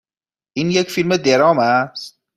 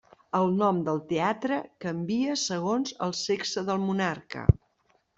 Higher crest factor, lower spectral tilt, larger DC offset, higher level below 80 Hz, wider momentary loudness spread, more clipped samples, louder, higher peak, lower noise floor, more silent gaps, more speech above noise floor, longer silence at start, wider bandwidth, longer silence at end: second, 16 dB vs 24 dB; about the same, -5 dB/octave vs -5.5 dB/octave; neither; second, -58 dBFS vs -46 dBFS; first, 14 LU vs 6 LU; neither; first, -16 LUFS vs -28 LUFS; about the same, -2 dBFS vs -4 dBFS; first, under -90 dBFS vs -69 dBFS; neither; first, over 74 dB vs 42 dB; first, 0.55 s vs 0.35 s; first, 15.5 kHz vs 8 kHz; second, 0.25 s vs 0.6 s